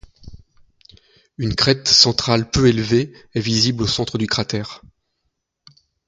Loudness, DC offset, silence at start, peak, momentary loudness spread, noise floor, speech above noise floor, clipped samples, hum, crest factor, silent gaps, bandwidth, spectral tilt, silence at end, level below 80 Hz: -17 LUFS; under 0.1%; 0.25 s; 0 dBFS; 14 LU; -74 dBFS; 56 dB; under 0.1%; none; 20 dB; none; 9.4 kHz; -4 dB/octave; 1.3 s; -42 dBFS